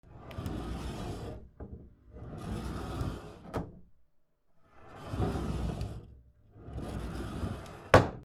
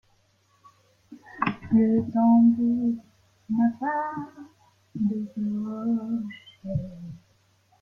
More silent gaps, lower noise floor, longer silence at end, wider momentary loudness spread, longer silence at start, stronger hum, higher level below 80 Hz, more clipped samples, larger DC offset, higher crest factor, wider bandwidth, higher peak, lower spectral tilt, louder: neither; about the same, -67 dBFS vs -65 dBFS; second, 0 s vs 0.65 s; second, 15 LU vs 20 LU; second, 0.05 s vs 1.1 s; neither; first, -44 dBFS vs -58 dBFS; neither; neither; first, 30 dB vs 16 dB; first, 16 kHz vs 5.4 kHz; first, -6 dBFS vs -10 dBFS; second, -6.5 dB/octave vs -9 dB/octave; second, -35 LUFS vs -25 LUFS